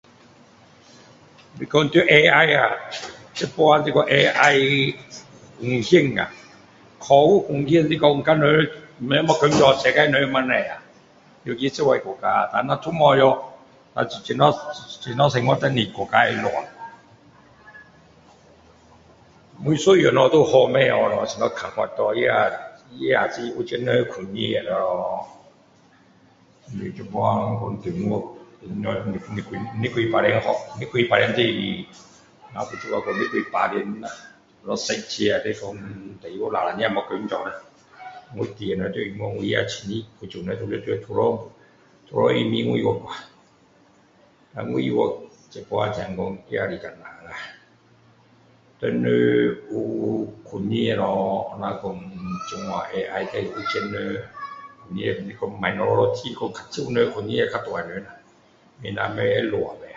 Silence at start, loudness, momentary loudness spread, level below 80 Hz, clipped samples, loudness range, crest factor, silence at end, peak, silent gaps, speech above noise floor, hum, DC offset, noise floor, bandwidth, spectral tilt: 1.55 s; -21 LUFS; 19 LU; -56 dBFS; under 0.1%; 10 LU; 22 dB; 0 s; 0 dBFS; none; 35 dB; none; under 0.1%; -56 dBFS; 7.8 kHz; -5.5 dB/octave